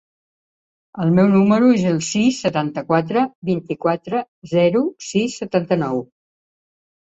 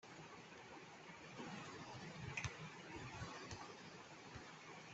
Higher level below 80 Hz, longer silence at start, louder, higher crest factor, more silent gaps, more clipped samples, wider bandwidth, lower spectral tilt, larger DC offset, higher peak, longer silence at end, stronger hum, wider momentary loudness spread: first, -58 dBFS vs -72 dBFS; first, 0.95 s vs 0 s; first, -19 LUFS vs -53 LUFS; second, 16 dB vs 28 dB; first, 3.35-3.42 s, 4.28-4.42 s vs none; neither; about the same, 8 kHz vs 8.2 kHz; first, -6 dB/octave vs -4 dB/octave; neither; first, -4 dBFS vs -26 dBFS; first, 1.05 s vs 0 s; neither; about the same, 10 LU vs 9 LU